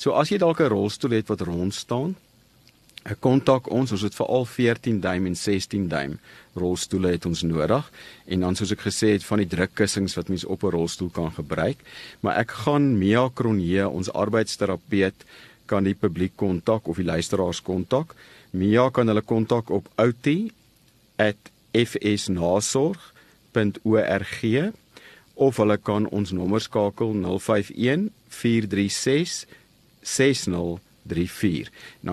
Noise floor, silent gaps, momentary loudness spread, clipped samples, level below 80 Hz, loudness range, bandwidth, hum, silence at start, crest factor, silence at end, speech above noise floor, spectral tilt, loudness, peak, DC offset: -59 dBFS; none; 9 LU; under 0.1%; -52 dBFS; 2 LU; 13 kHz; none; 0 s; 20 dB; 0 s; 35 dB; -5.5 dB/octave; -24 LUFS; -4 dBFS; under 0.1%